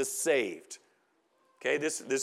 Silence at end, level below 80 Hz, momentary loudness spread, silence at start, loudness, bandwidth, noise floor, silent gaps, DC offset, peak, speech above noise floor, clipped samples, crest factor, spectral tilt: 0 s; under -90 dBFS; 19 LU; 0 s; -31 LUFS; 16 kHz; -72 dBFS; none; under 0.1%; -16 dBFS; 40 dB; under 0.1%; 18 dB; -2 dB/octave